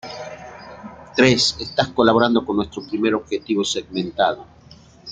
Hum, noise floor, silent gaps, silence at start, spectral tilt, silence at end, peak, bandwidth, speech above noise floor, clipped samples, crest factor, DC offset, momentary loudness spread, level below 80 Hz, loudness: none; -45 dBFS; none; 0.05 s; -4 dB/octave; 0 s; 0 dBFS; 9.4 kHz; 26 dB; under 0.1%; 20 dB; under 0.1%; 22 LU; -52 dBFS; -19 LUFS